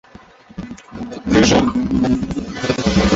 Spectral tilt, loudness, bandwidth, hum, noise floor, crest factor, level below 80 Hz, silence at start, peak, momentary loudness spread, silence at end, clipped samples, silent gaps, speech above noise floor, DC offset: -5 dB/octave; -17 LUFS; 8 kHz; none; -43 dBFS; 16 dB; -32 dBFS; 0.55 s; -2 dBFS; 20 LU; 0 s; under 0.1%; none; 27 dB; under 0.1%